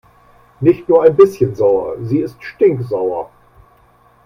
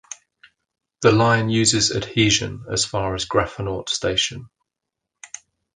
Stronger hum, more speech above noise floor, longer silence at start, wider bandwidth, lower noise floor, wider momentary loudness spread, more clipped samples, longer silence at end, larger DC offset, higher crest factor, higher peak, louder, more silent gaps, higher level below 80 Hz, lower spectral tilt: neither; second, 37 dB vs 63 dB; first, 0.6 s vs 0.1 s; about the same, 10 kHz vs 10 kHz; second, -50 dBFS vs -83 dBFS; second, 11 LU vs 22 LU; neither; first, 1 s vs 0.5 s; neither; about the same, 16 dB vs 20 dB; about the same, 0 dBFS vs -2 dBFS; first, -14 LUFS vs -20 LUFS; neither; about the same, -50 dBFS vs -46 dBFS; first, -9 dB/octave vs -3.5 dB/octave